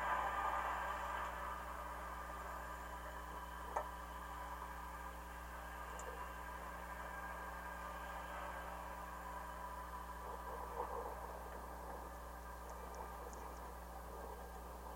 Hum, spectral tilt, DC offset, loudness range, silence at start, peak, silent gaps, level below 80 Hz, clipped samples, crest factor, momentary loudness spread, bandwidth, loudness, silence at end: 60 Hz at -55 dBFS; -4 dB/octave; under 0.1%; 3 LU; 0 s; -26 dBFS; none; -56 dBFS; under 0.1%; 22 dB; 8 LU; 16.5 kHz; -48 LUFS; 0 s